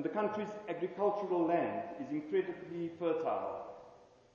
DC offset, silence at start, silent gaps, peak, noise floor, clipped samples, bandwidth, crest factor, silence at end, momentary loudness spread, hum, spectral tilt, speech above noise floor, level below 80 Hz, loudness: under 0.1%; 0 s; none; -18 dBFS; -60 dBFS; under 0.1%; 7.2 kHz; 18 dB; 0.3 s; 10 LU; none; -8 dB/octave; 24 dB; -78 dBFS; -36 LUFS